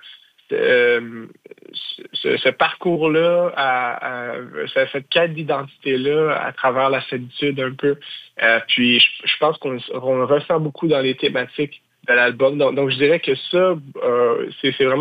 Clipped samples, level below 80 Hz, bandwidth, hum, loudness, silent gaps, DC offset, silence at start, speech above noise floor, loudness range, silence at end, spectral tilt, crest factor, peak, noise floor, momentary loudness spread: under 0.1%; -68 dBFS; 5 kHz; none; -18 LUFS; none; under 0.1%; 0.05 s; 27 dB; 3 LU; 0 s; -7 dB/octave; 16 dB; -2 dBFS; -45 dBFS; 12 LU